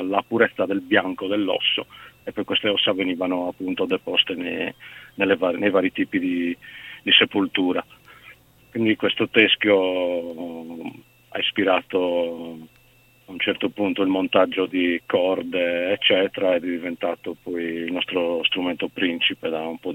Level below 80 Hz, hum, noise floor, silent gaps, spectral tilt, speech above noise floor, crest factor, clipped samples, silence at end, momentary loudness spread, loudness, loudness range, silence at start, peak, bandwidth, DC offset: -64 dBFS; none; -56 dBFS; none; -6 dB/octave; 33 dB; 22 dB; under 0.1%; 0 s; 15 LU; -22 LUFS; 3 LU; 0 s; 0 dBFS; 16.5 kHz; under 0.1%